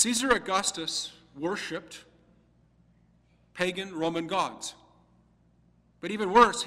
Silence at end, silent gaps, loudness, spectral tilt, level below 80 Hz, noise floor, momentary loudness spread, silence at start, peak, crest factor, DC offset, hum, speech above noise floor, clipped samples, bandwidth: 0 s; none; -28 LUFS; -2.5 dB/octave; -60 dBFS; -64 dBFS; 17 LU; 0 s; -6 dBFS; 24 dB; under 0.1%; none; 36 dB; under 0.1%; 16 kHz